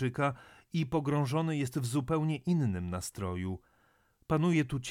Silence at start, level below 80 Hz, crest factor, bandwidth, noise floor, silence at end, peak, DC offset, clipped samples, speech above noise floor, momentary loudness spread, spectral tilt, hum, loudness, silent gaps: 0 s; -58 dBFS; 16 dB; 16 kHz; -69 dBFS; 0 s; -18 dBFS; under 0.1%; under 0.1%; 38 dB; 9 LU; -6.5 dB/octave; none; -32 LUFS; none